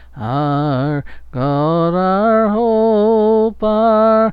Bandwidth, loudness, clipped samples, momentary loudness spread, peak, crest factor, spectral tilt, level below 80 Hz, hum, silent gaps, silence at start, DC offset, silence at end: 5.2 kHz; -15 LUFS; under 0.1%; 9 LU; -4 dBFS; 10 dB; -10.5 dB/octave; -40 dBFS; none; none; 0 s; under 0.1%; 0 s